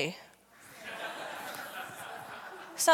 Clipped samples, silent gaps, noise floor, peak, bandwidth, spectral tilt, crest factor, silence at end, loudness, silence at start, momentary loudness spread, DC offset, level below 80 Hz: under 0.1%; none; -56 dBFS; -10 dBFS; 17.5 kHz; -1.5 dB/octave; 26 dB; 0 s; -39 LUFS; 0 s; 14 LU; under 0.1%; -80 dBFS